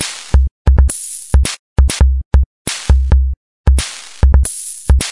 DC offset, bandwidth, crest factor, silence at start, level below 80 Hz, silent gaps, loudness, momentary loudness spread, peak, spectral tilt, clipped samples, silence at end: 0.6%; 11.5 kHz; 12 dB; 0 s; -14 dBFS; 0.51-0.65 s, 1.59-1.76 s, 2.25-2.31 s, 2.46-2.65 s, 3.37-3.64 s; -15 LUFS; 8 LU; 0 dBFS; -4.5 dB/octave; under 0.1%; 0 s